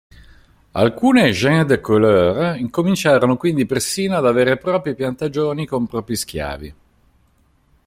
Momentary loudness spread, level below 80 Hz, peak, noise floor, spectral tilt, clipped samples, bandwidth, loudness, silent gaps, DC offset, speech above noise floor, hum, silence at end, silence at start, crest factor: 10 LU; -46 dBFS; -2 dBFS; -58 dBFS; -5.5 dB/octave; under 0.1%; 16 kHz; -17 LUFS; none; under 0.1%; 41 dB; none; 1.15 s; 0.75 s; 16 dB